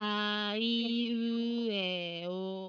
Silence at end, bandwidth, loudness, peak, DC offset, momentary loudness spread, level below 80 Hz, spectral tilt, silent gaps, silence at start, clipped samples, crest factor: 0 s; 5.4 kHz; -33 LUFS; -18 dBFS; under 0.1%; 6 LU; under -90 dBFS; -6 dB/octave; none; 0 s; under 0.1%; 14 dB